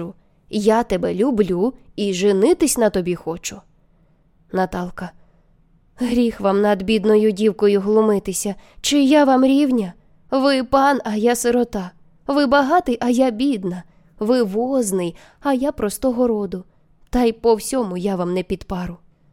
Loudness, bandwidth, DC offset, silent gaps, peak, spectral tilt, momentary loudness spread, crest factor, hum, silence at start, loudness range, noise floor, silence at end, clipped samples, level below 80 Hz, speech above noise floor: -19 LUFS; 16.5 kHz; under 0.1%; none; -4 dBFS; -5 dB/octave; 13 LU; 16 dB; none; 0 s; 5 LU; -56 dBFS; 0.35 s; under 0.1%; -44 dBFS; 38 dB